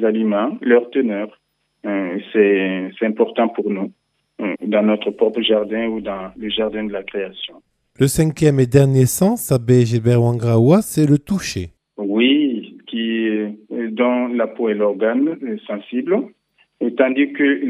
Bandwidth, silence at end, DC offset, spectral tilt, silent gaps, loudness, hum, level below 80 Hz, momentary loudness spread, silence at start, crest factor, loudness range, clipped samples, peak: 15 kHz; 0 s; under 0.1%; -6 dB/octave; none; -18 LUFS; none; -50 dBFS; 12 LU; 0 s; 18 dB; 5 LU; under 0.1%; 0 dBFS